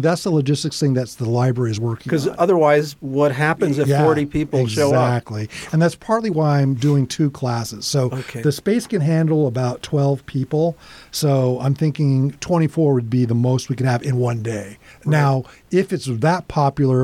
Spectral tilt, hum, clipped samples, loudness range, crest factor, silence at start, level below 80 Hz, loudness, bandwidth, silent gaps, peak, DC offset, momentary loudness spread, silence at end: -6.5 dB/octave; none; under 0.1%; 2 LU; 16 dB; 0 s; -50 dBFS; -19 LUFS; 14.5 kHz; none; -2 dBFS; under 0.1%; 7 LU; 0 s